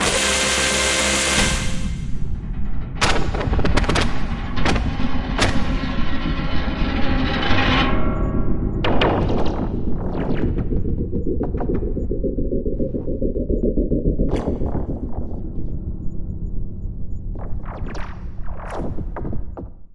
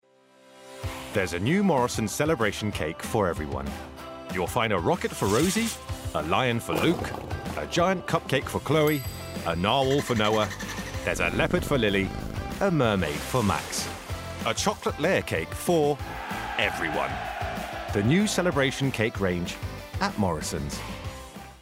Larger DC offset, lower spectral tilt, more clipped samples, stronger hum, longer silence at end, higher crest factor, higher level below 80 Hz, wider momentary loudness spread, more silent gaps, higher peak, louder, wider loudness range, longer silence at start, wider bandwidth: first, 3% vs under 0.1%; about the same, -4 dB/octave vs -5 dB/octave; neither; neither; about the same, 0 s vs 0 s; about the same, 16 dB vs 20 dB; first, -26 dBFS vs -44 dBFS; first, 15 LU vs 11 LU; neither; first, -2 dBFS vs -8 dBFS; first, -22 LUFS vs -27 LUFS; first, 11 LU vs 2 LU; second, 0 s vs 0.55 s; second, 11.5 kHz vs 16 kHz